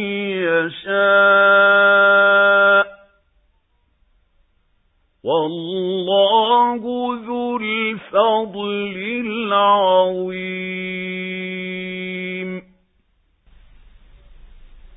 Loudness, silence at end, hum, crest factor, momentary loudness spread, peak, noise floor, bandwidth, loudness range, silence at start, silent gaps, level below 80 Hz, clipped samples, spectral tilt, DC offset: -17 LUFS; 0.1 s; none; 16 dB; 14 LU; -2 dBFS; -63 dBFS; 4 kHz; 14 LU; 0 s; none; -54 dBFS; under 0.1%; -9.5 dB/octave; under 0.1%